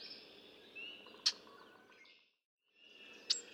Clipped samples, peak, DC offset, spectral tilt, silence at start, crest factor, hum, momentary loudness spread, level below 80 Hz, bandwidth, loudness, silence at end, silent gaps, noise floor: under 0.1%; -18 dBFS; under 0.1%; 1.5 dB/octave; 0 s; 30 dB; none; 25 LU; under -90 dBFS; 17.5 kHz; -40 LUFS; 0 s; 2.45-2.58 s; -66 dBFS